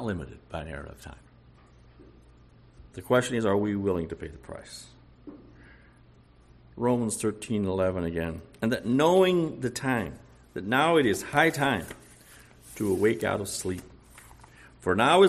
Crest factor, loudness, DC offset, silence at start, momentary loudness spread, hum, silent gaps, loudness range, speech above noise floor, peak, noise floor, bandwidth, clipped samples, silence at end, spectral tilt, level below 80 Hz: 22 dB; -27 LUFS; under 0.1%; 0 s; 22 LU; none; none; 8 LU; 30 dB; -8 dBFS; -56 dBFS; 14 kHz; under 0.1%; 0 s; -5 dB/octave; -54 dBFS